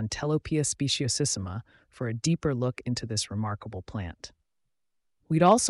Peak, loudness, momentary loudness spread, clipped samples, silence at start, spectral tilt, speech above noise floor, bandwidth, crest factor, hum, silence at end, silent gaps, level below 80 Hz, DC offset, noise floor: -8 dBFS; -29 LUFS; 12 LU; under 0.1%; 0 s; -4.5 dB/octave; 53 dB; 11.5 kHz; 20 dB; none; 0 s; none; -54 dBFS; under 0.1%; -81 dBFS